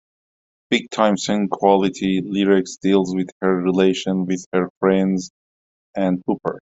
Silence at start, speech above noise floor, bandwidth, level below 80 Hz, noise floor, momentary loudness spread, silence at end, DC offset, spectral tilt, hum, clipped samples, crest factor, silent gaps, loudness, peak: 0.7 s; over 71 dB; 8 kHz; -60 dBFS; under -90 dBFS; 7 LU; 0.15 s; under 0.1%; -6 dB/octave; none; under 0.1%; 18 dB; 3.32-3.41 s, 4.46-4.52 s, 4.70-4.81 s, 5.30-5.94 s; -20 LUFS; -2 dBFS